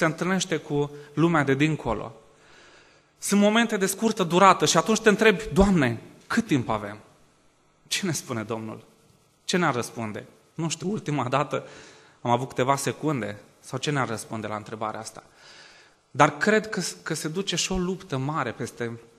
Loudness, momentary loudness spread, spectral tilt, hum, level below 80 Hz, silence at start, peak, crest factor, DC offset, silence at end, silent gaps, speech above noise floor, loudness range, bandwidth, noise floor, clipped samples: -25 LUFS; 15 LU; -4.5 dB/octave; none; -48 dBFS; 0 s; -2 dBFS; 24 dB; under 0.1%; 0.15 s; none; 37 dB; 9 LU; 13 kHz; -62 dBFS; under 0.1%